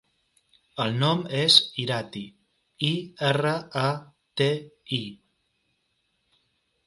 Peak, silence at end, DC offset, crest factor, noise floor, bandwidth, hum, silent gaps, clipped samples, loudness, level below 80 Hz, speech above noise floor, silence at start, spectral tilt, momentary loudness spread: -2 dBFS; 1.7 s; under 0.1%; 26 dB; -74 dBFS; 11.5 kHz; none; none; under 0.1%; -24 LUFS; -68 dBFS; 49 dB; 0.75 s; -4.5 dB/octave; 20 LU